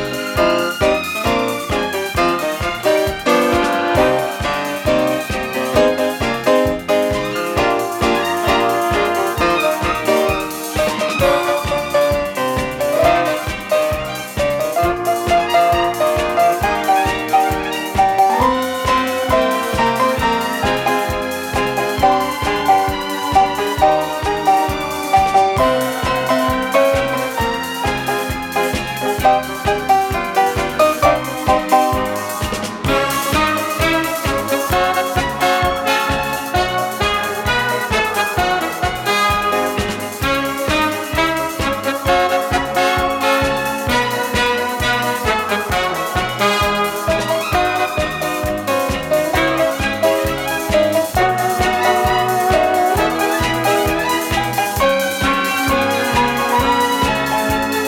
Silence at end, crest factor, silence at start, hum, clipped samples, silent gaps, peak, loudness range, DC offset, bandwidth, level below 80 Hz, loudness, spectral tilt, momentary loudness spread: 0 s; 16 dB; 0 s; none; under 0.1%; none; 0 dBFS; 2 LU; under 0.1%; 18.5 kHz; -34 dBFS; -16 LUFS; -4 dB/octave; 5 LU